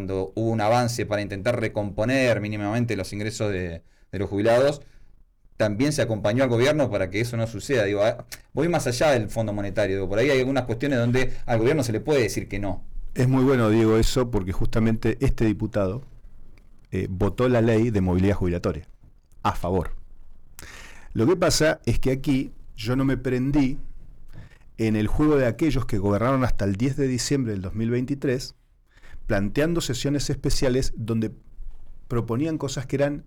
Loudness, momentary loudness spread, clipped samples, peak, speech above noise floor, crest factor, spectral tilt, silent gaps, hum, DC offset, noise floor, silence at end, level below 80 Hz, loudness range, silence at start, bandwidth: -24 LUFS; 10 LU; under 0.1%; -14 dBFS; 30 dB; 10 dB; -6 dB/octave; none; none; under 0.1%; -52 dBFS; 0.05 s; -34 dBFS; 4 LU; 0 s; 18 kHz